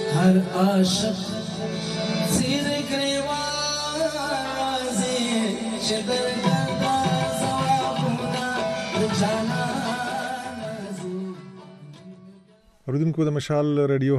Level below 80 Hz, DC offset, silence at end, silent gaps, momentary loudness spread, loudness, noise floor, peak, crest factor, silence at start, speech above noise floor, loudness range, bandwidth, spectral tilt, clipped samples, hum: -54 dBFS; under 0.1%; 0 s; none; 11 LU; -24 LUFS; -55 dBFS; -8 dBFS; 16 dB; 0 s; 33 dB; 6 LU; 13.5 kHz; -5 dB/octave; under 0.1%; none